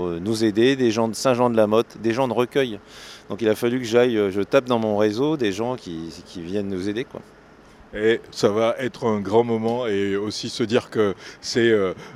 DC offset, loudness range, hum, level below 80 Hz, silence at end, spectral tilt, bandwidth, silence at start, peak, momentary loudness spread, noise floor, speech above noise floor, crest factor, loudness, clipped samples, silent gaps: under 0.1%; 4 LU; none; -58 dBFS; 0 s; -5.5 dB/octave; 14 kHz; 0 s; -2 dBFS; 13 LU; -48 dBFS; 26 dB; 20 dB; -22 LUFS; under 0.1%; none